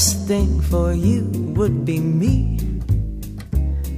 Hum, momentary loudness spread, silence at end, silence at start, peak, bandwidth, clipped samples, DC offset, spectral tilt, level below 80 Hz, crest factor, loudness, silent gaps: none; 6 LU; 0 s; 0 s; -2 dBFS; 15.5 kHz; under 0.1%; under 0.1%; -5.5 dB/octave; -24 dBFS; 16 dB; -20 LUFS; none